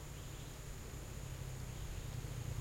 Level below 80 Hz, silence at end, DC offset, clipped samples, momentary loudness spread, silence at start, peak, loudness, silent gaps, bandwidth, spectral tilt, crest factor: -50 dBFS; 0 s; under 0.1%; under 0.1%; 4 LU; 0 s; -32 dBFS; -48 LUFS; none; 16.5 kHz; -5 dB/octave; 14 dB